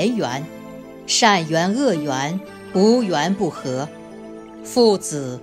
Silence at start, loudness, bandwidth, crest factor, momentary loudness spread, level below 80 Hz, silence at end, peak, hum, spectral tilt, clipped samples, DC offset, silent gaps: 0 s; -19 LUFS; 16 kHz; 18 dB; 21 LU; -60 dBFS; 0 s; -2 dBFS; none; -4 dB/octave; under 0.1%; under 0.1%; none